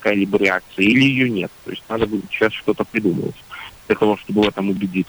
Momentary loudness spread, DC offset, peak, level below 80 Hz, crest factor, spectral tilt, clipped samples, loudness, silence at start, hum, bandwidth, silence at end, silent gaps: 14 LU; under 0.1%; -4 dBFS; -50 dBFS; 16 dB; -6.5 dB/octave; under 0.1%; -19 LUFS; 0 s; none; over 20 kHz; 0.05 s; none